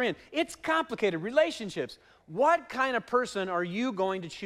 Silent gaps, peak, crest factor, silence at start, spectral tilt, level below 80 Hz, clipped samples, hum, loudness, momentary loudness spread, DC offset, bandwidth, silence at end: none; -12 dBFS; 18 dB; 0 s; -4.5 dB/octave; -68 dBFS; under 0.1%; none; -29 LUFS; 9 LU; under 0.1%; 14.5 kHz; 0 s